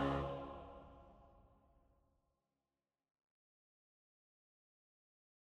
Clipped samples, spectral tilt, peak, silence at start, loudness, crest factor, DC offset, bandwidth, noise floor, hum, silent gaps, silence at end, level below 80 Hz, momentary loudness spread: under 0.1%; -8 dB/octave; -26 dBFS; 0 s; -46 LUFS; 24 dB; under 0.1%; 9.6 kHz; under -90 dBFS; none; none; 3.95 s; -62 dBFS; 23 LU